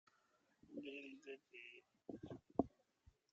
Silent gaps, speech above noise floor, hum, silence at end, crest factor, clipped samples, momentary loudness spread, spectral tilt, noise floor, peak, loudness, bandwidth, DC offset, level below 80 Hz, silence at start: none; 31 dB; none; 0.25 s; 30 dB; under 0.1%; 13 LU; -5 dB/octave; -80 dBFS; -22 dBFS; -51 LUFS; 7.6 kHz; under 0.1%; -74 dBFS; 0.7 s